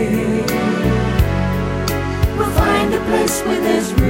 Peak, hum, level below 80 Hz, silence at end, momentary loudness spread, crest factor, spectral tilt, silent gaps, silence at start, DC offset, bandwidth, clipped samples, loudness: 0 dBFS; none; -24 dBFS; 0 s; 4 LU; 16 dB; -5.5 dB/octave; none; 0 s; under 0.1%; 16 kHz; under 0.1%; -17 LUFS